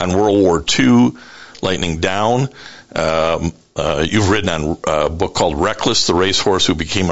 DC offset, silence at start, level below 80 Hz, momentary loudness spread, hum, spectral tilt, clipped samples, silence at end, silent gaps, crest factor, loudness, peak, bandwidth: 2%; 0 s; -38 dBFS; 9 LU; none; -4.5 dB/octave; under 0.1%; 0 s; none; 14 dB; -16 LUFS; -2 dBFS; 8.2 kHz